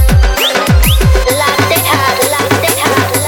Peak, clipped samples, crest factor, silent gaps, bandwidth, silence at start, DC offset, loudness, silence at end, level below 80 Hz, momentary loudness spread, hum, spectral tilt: 0 dBFS; under 0.1%; 10 dB; none; 18 kHz; 0 s; under 0.1%; -10 LUFS; 0 s; -14 dBFS; 2 LU; none; -4 dB/octave